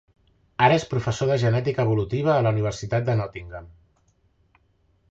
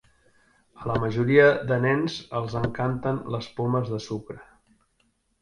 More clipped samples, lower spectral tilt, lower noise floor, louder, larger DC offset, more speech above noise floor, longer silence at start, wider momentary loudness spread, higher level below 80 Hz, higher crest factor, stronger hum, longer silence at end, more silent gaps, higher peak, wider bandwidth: neither; about the same, -6.5 dB/octave vs -7 dB/octave; second, -64 dBFS vs -69 dBFS; about the same, -23 LUFS vs -25 LUFS; neither; about the same, 42 dB vs 45 dB; second, 0.6 s vs 0.8 s; about the same, 17 LU vs 17 LU; about the same, -50 dBFS vs -54 dBFS; about the same, 20 dB vs 22 dB; neither; first, 1.45 s vs 1 s; neither; about the same, -4 dBFS vs -4 dBFS; second, 7.8 kHz vs 10.5 kHz